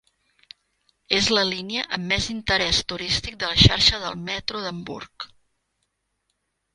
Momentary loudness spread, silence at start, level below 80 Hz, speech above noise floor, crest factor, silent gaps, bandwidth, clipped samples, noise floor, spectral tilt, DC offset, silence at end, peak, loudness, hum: 19 LU; 1.1 s; -40 dBFS; 52 dB; 24 dB; none; 11.5 kHz; under 0.1%; -75 dBFS; -3.5 dB/octave; under 0.1%; 1.5 s; 0 dBFS; -21 LUFS; none